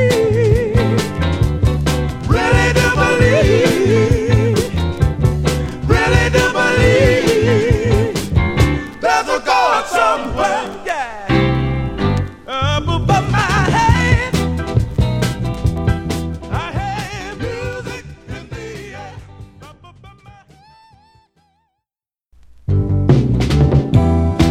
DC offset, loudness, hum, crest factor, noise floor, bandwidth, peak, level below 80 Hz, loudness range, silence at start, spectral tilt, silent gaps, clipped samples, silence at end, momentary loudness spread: under 0.1%; -15 LUFS; none; 16 dB; -89 dBFS; 15.5 kHz; 0 dBFS; -24 dBFS; 13 LU; 0 s; -6 dB/octave; none; under 0.1%; 0 s; 12 LU